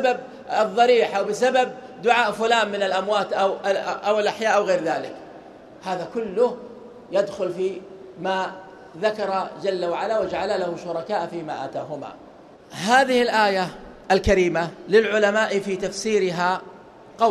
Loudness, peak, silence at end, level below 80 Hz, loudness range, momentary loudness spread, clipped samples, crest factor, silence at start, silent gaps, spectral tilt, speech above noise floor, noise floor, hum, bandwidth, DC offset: -22 LUFS; -2 dBFS; 0 s; -48 dBFS; 6 LU; 13 LU; under 0.1%; 20 dB; 0 s; none; -4 dB/octave; 24 dB; -46 dBFS; none; 13.5 kHz; under 0.1%